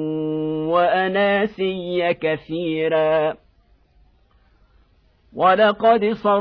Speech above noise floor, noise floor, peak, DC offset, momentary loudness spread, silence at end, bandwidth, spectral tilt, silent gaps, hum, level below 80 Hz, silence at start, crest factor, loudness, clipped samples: 39 dB; -57 dBFS; -4 dBFS; under 0.1%; 9 LU; 0 s; 5.4 kHz; -8.5 dB/octave; none; none; -56 dBFS; 0 s; 16 dB; -19 LUFS; under 0.1%